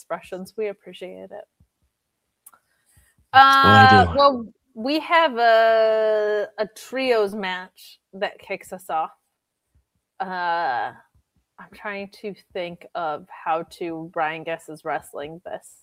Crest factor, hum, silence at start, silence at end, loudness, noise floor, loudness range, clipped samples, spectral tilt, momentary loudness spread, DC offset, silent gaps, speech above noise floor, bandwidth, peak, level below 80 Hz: 22 dB; none; 0.1 s; 0.25 s; -19 LUFS; -77 dBFS; 15 LU; under 0.1%; -5.5 dB/octave; 22 LU; under 0.1%; none; 56 dB; 16 kHz; 0 dBFS; -58 dBFS